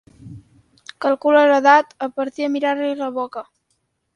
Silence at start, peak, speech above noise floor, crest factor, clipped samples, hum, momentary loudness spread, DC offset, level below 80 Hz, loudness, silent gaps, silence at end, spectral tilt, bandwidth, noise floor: 0.25 s; 0 dBFS; 52 dB; 20 dB; under 0.1%; none; 14 LU; under 0.1%; -64 dBFS; -18 LUFS; none; 0.75 s; -5 dB/octave; 10 kHz; -70 dBFS